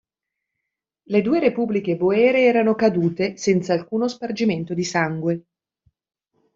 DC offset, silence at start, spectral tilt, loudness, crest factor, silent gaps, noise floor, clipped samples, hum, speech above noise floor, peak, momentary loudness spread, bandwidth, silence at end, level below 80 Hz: under 0.1%; 1.1 s; -6 dB/octave; -20 LUFS; 16 dB; none; -83 dBFS; under 0.1%; none; 64 dB; -4 dBFS; 8 LU; 7.8 kHz; 1.15 s; -62 dBFS